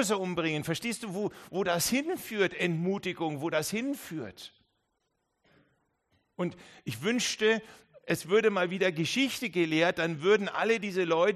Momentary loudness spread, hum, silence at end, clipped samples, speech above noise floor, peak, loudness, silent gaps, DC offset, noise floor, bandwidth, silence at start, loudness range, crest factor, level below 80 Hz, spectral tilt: 10 LU; none; 0 s; under 0.1%; 50 dB; -12 dBFS; -30 LUFS; none; under 0.1%; -79 dBFS; 13 kHz; 0 s; 10 LU; 18 dB; -68 dBFS; -4 dB/octave